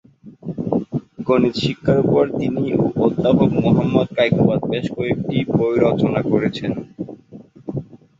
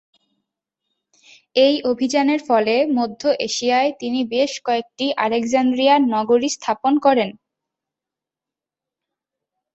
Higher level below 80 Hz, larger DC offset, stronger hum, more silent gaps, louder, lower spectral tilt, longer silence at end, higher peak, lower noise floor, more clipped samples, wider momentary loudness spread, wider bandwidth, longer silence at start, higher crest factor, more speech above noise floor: first, -48 dBFS vs -66 dBFS; neither; neither; neither; about the same, -18 LUFS vs -19 LUFS; first, -8.5 dB/octave vs -3.5 dB/octave; second, 0.25 s vs 2.45 s; about the same, -2 dBFS vs -2 dBFS; second, -42 dBFS vs -88 dBFS; neither; first, 14 LU vs 6 LU; about the same, 7.8 kHz vs 8.2 kHz; second, 0.25 s vs 1.55 s; about the same, 16 dB vs 18 dB; second, 25 dB vs 70 dB